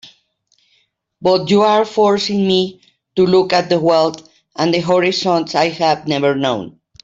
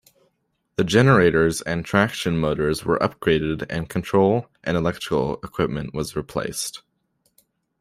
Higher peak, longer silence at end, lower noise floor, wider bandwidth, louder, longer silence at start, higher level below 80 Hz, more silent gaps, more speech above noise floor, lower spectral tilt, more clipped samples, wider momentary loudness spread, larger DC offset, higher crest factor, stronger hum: about the same, -2 dBFS vs -2 dBFS; second, 0.35 s vs 1 s; second, -62 dBFS vs -70 dBFS; second, 7.8 kHz vs 15.5 kHz; first, -15 LUFS vs -22 LUFS; second, 0.05 s vs 0.8 s; second, -56 dBFS vs -46 dBFS; neither; about the same, 47 dB vs 49 dB; about the same, -5.5 dB/octave vs -5.5 dB/octave; neither; about the same, 9 LU vs 11 LU; neither; second, 14 dB vs 20 dB; neither